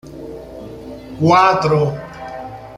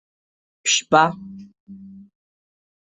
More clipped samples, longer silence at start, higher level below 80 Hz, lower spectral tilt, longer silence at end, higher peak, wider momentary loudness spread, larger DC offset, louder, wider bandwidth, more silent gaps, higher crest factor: neither; second, 0.05 s vs 0.65 s; first, -46 dBFS vs -66 dBFS; first, -6.5 dB/octave vs -2 dB/octave; second, 0 s vs 1.1 s; about the same, 0 dBFS vs 0 dBFS; second, 21 LU vs 24 LU; neither; first, -14 LUFS vs -18 LUFS; first, 11.5 kHz vs 8.4 kHz; second, none vs 1.60-1.67 s; second, 18 dB vs 24 dB